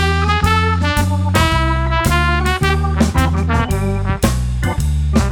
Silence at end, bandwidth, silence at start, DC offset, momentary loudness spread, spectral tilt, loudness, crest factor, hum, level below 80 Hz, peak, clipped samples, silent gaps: 0 s; 19 kHz; 0 s; under 0.1%; 4 LU; -5.5 dB/octave; -16 LUFS; 14 dB; none; -20 dBFS; 0 dBFS; under 0.1%; none